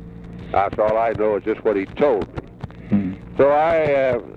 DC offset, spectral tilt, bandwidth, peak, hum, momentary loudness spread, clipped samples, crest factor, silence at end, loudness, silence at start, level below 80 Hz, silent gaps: under 0.1%; -8.5 dB/octave; 6.8 kHz; -6 dBFS; none; 17 LU; under 0.1%; 14 dB; 0.1 s; -20 LUFS; 0 s; -44 dBFS; none